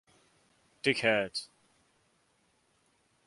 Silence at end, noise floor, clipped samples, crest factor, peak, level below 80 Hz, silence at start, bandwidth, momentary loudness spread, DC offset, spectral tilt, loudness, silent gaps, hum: 1.8 s; -72 dBFS; under 0.1%; 26 dB; -10 dBFS; -74 dBFS; 0.85 s; 11.5 kHz; 14 LU; under 0.1%; -4 dB/octave; -30 LUFS; none; none